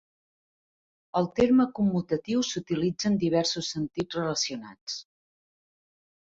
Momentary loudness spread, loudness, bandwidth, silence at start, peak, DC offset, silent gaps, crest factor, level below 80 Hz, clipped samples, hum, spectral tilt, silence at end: 14 LU; -27 LUFS; 7.8 kHz; 1.15 s; -10 dBFS; under 0.1%; 4.81-4.87 s; 18 dB; -60 dBFS; under 0.1%; none; -5 dB/octave; 1.3 s